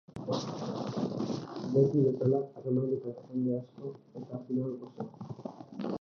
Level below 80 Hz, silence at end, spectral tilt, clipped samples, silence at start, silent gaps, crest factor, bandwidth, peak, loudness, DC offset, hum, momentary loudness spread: -72 dBFS; 0.05 s; -8.5 dB/octave; under 0.1%; 0.1 s; none; 20 dB; 7 kHz; -14 dBFS; -33 LUFS; under 0.1%; none; 16 LU